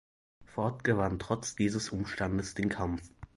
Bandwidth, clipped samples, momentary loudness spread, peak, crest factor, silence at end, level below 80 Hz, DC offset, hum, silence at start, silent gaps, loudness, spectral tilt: 11.5 kHz; under 0.1%; 6 LU; -14 dBFS; 20 dB; 0.1 s; -50 dBFS; under 0.1%; none; 0.4 s; none; -33 LUFS; -5.5 dB/octave